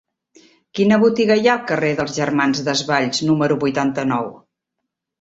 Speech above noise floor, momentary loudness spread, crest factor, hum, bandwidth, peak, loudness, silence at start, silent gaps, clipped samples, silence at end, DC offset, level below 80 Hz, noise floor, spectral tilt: 62 dB; 7 LU; 18 dB; none; 8 kHz; -2 dBFS; -18 LUFS; 0.75 s; none; under 0.1%; 0.85 s; under 0.1%; -58 dBFS; -79 dBFS; -5 dB/octave